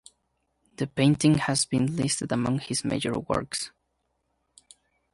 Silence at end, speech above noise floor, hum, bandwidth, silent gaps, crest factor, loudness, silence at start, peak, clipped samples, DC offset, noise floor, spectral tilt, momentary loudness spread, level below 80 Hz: 1.45 s; 50 dB; none; 11.5 kHz; none; 18 dB; -26 LUFS; 0.8 s; -8 dBFS; under 0.1%; under 0.1%; -76 dBFS; -4.5 dB/octave; 11 LU; -56 dBFS